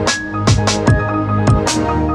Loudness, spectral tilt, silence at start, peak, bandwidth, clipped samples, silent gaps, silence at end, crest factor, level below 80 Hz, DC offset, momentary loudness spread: -15 LUFS; -5 dB/octave; 0 s; 0 dBFS; 12 kHz; under 0.1%; none; 0 s; 14 dB; -26 dBFS; under 0.1%; 3 LU